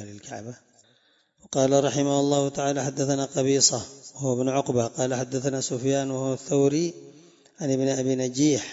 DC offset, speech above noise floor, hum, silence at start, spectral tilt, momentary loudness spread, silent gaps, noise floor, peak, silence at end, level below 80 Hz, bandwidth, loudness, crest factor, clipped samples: under 0.1%; 40 dB; none; 0 s; -4.5 dB/octave; 11 LU; none; -64 dBFS; -6 dBFS; 0 s; -66 dBFS; 8 kHz; -24 LUFS; 20 dB; under 0.1%